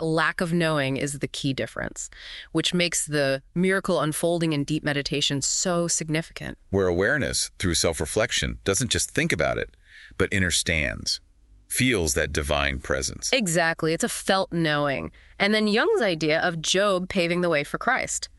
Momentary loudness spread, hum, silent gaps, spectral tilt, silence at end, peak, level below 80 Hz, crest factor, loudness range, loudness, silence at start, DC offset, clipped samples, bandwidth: 7 LU; none; none; -3.5 dB/octave; 0.1 s; -4 dBFS; -44 dBFS; 20 dB; 2 LU; -24 LUFS; 0 s; under 0.1%; under 0.1%; 12.5 kHz